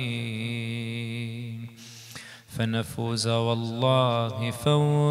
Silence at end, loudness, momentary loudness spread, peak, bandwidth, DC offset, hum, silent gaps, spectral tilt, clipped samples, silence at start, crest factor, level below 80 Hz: 0 s; -27 LUFS; 19 LU; -8 dBFS; 15 kHz; under 0.1%; none; none; -6 dB/octave; under 0.1%; 0 s; 18 dB; -62 dBFS